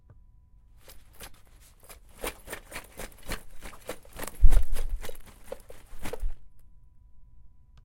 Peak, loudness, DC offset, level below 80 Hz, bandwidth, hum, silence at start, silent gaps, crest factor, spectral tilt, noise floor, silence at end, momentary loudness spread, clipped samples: -2 dBFS; -36 LUFS; under 0.1%; -30 dBFS; 16.5 kHz; none; 1.2 s; none; 24 dB; -4.5 dB/octave; -55 dBFS; 1.25 s; 25 LU; under 0.1%